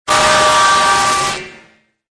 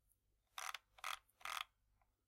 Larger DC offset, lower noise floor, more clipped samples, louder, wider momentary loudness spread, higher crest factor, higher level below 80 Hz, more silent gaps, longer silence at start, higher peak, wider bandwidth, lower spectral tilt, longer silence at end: neither; second, -49 dBFS vs -82 dBFS; neither; first, -11 LUFS vs -50 LUFS; first, 9 LU vs 5 LU; second, 12 dB vs 26 dB; first, -42 dBFS vs -82 dBFS; neither; second, 0.05 s vs 0.55 s; first, -2 dBFS vs -28 dBFS; second, 11 kHz vs 16 kHz; first, -1 dB/octave vs 2.5 dB/octave; about the same, 0.6 s vs 0.6 s